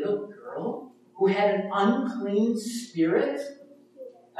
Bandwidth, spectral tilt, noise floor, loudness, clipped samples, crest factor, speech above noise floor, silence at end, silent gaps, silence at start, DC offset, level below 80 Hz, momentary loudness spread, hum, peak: 13.5 kHz; -6 dB/octave; -47 dBFS; -26 LUFS; under 0.1%; 18 dB; 21 dB; 0 s; none; 0 s; under 0.1%; -80 dBFS; 16 LU; none; -10 dBFS